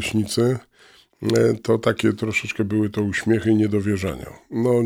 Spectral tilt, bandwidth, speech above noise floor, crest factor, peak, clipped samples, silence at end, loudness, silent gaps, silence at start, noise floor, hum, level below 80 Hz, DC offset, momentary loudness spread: -6 dB/octave; 16 kHz; 32 dB; 16 dB; -6 dBFS; under 0.1%; 0 s; -21 LUFS; none; 0 s; -53 dBFS; none; -52 dBFS; under 0.1%; 9 LU